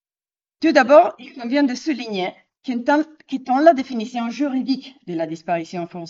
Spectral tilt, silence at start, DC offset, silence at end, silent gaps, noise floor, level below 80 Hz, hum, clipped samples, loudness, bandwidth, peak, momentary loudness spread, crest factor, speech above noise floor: -5.5 dB/octave; 0.6 s; under 0.1%; 0 s; none; under -90 dBFS; -72 dBFS; none; under 0.1%; -19 LUFS; 7.6 kHz; 0 dBFS; 15 LU; 18 dB; over 71 dB